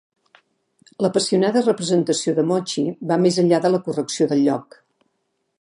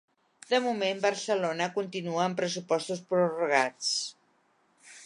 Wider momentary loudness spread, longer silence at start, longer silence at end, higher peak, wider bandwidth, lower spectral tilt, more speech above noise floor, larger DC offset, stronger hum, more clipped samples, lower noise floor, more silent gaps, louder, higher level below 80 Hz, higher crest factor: about the same, 7 LU vs 6 LU; first, 1 s vs 0.5 s; first, 1 s vs 0 s; first, -4 dBFS vs -8 dBFS; about the same, 11 kHz vs 11.5 kHz; first, -5.5 dB/octave vs -3.5 dB/octave; first, 53 dB vs 40 dB; neither; neither; neither; about the same, -72 dBFS vs -69 dBFS; neither; first, -20 LUFS vs -29 LUFS; first, -72 dBFS vs -84 dBFS; second, 16 dB vs 22 dB